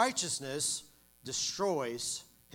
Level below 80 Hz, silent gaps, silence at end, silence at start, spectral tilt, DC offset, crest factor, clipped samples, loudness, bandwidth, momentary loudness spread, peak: -72 dBFS; none; 0.3 s; 0 s; -2 dB/octave; under 0.1%; 22 dB; under 0.1%; -34 LUFS; 19 kHz; 7 LU; -12 dBFS